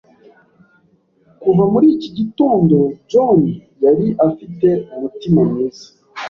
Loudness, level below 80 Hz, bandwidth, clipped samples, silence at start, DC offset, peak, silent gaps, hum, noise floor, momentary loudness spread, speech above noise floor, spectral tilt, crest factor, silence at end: -15 LUFS; -52 dBFS; 6.8 kHz; under 0.1%; 1.4 s; under 0.1%; -2 dBFS; none; none; -56 dBFS; 10 LU; 42 dB; -9 dB/octave; 14 dB; 0 s